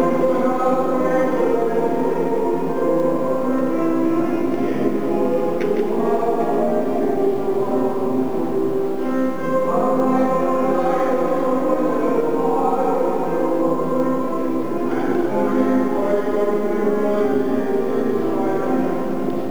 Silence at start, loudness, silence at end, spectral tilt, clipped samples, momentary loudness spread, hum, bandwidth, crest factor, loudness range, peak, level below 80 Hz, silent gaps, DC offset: 0 s; -20 LUFS; 0 s; -7.5 dB/octave; under 0.1%; 3 LU; none; over 20 kHz; 14 dB; 1 LU; -6 dBFS; -62 dBFS; none; 5%